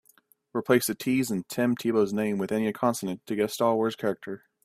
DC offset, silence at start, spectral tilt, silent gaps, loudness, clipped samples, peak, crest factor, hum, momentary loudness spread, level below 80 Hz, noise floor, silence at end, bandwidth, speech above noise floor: under 0.1%; 0.55 s; -5 dB/octave; none; -27 LUFS; under 0.1%; -8 dBFS; 18 dB; none; 9 LU; -68 dBFS; -63 dBFS; 0.3 s; 16 kHz; 37 dB